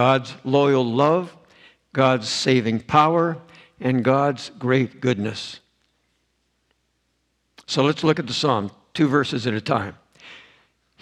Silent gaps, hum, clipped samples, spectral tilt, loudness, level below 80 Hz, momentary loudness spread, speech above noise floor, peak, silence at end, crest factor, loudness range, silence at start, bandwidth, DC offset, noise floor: none; none; under 0.1%; -5.5 dB/octave; -21 LUFS; -64 dBFS; 11 LU; 50 dB; 0 dBFS; 0.65 s; 22 dB; 7 LU; 0 s; 10.5 kHz; under 0.1%; -70 dBFS